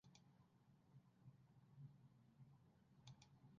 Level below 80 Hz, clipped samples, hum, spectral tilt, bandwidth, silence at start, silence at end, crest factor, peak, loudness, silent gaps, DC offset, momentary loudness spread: -88 dBFS; under 0.1%; none; -6.5 dB/octave; 6.6 kHz; 0.05 s; 0 s; 20 dB; -48 dBFS; -67 LUFS; none; under 0.1%; 4 LU